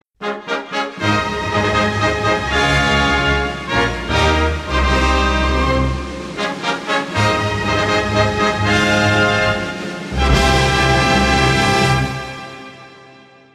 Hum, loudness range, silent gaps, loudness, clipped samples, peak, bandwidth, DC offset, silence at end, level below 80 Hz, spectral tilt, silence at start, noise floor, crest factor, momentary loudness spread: none; 3 LU; none; -16 LUFS; under 0.1%; -2 dBFS; 14 kHz; under 0.1%; 0.5 s; -26 dBFS; -4.5 dB/octave; 0.2 s; -44 dBFS; 14 dB; 10 LU